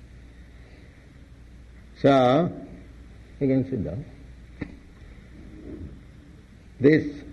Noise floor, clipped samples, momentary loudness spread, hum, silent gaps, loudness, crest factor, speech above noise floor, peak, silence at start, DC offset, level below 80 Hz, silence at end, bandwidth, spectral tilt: -48 dBFS; under 0.1%; 27 LU; none; none; -22 LUFS; 22 dB; 27 dB; -6 dBFS; 0.15 s; under 0.1%; -48 dBFS; 0 s; 8 kHz; -8 dB/octave